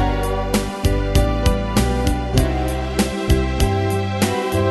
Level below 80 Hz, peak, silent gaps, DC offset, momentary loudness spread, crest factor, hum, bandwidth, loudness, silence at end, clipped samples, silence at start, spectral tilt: -22 dBFS; 0 dBFS; none; under 0.1%; 3 LU; 18 dB; none; 12.5 kHz; -20 LUFS; 0 s; under 0.1%; 0 s; -5.5 dB/octave